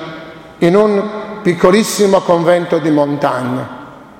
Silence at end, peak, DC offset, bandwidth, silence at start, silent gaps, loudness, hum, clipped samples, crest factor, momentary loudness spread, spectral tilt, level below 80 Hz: 0.15 s; 0 dBFS; under 0.1%; 16.5 kHz; 0 s; none; -13 LUFS; none; under 0.1%; 14 dB; 18 LU; -5.5 dB/octave; -50 dBFS